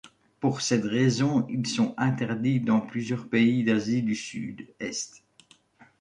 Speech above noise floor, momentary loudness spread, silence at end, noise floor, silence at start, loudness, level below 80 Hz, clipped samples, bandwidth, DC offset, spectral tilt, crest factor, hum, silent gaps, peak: 34 dB; 11 LU; 0.9 s; -59 dBFS; 0.05 s; -26 LUFS; -66 dBFS; under 0.1%; 10.5 kHz; under 0.1%; -5.5 dB/octave; 16 dB; none; none; -10 dBFS